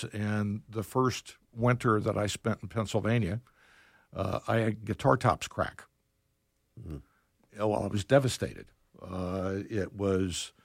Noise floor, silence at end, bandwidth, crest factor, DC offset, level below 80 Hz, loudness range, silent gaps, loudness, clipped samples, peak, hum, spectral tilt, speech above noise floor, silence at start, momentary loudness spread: -75 dBFS; 0.15 s; 16 kHz; 22 dB; under 0.1%; -56 dBFS; 2 LU; none; -31 LUFS; under 0.1%; -8 dBFS; none; -6 dB/octave; 45 dB; 0 s; 17 LU